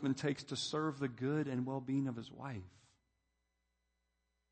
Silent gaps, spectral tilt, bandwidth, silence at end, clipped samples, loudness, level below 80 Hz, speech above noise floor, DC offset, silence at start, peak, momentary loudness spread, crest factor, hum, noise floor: none; -5.5 dB/octave; 8.4 kHz; 1.8 s; under 0.1%; -39 LUFS; -78 dBFS; 45 dB; under 0.1%; 0 s; -24 dBFS; 10 LU; 18 dB; none; -84 dBFS